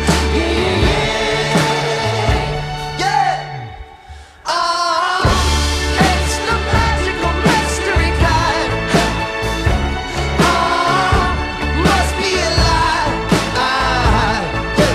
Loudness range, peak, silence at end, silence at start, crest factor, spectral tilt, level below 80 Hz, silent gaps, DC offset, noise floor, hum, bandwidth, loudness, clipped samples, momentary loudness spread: 3 LU; -2 dBFS; 0 s; 0 s; 14 dB; -4.5 dB/octave; -22 dBFS; none; under 0.1%; -37 dBFS; none; 15.5 kHz; -15 LUFS; under 0.1%; 5 LU